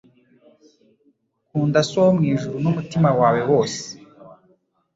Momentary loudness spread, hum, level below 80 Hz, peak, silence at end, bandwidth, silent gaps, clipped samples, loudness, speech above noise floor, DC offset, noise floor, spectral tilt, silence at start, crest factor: 13 LU; none; -58 dBFS; -4 dBFS; 0.65 s; 7.8 kHz; none; under 0.1%; -19 LUFS; 45 dB; under 0.1%; -64 dBFS; -6.5 dB/octave; 1.55 s; 18 dB